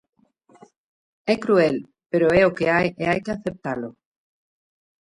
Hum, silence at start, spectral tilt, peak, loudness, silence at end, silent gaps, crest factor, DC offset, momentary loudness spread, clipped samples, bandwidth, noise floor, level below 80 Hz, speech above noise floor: none; 1.25 s; -7 dB/octave; -6 dBFS; -21 LUFS; 1.15 s; none; 18 dB; under 0.1%; 13 LU; under 0.1%; 11.5 kHz; -54 dBFS; -54 dBFS; 34 dB